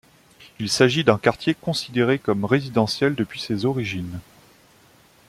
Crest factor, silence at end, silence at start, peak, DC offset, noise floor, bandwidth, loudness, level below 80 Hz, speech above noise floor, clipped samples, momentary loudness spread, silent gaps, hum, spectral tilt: 22 dB; 1.05 s; 0.4 s; 0 dBFS; under 0.1%; -54 dBFS; 15.5 kHz; -22 LUFS; -56 dBFS; 33 dB; under 0.1%; 11 LU; none; none; -5 dB/octave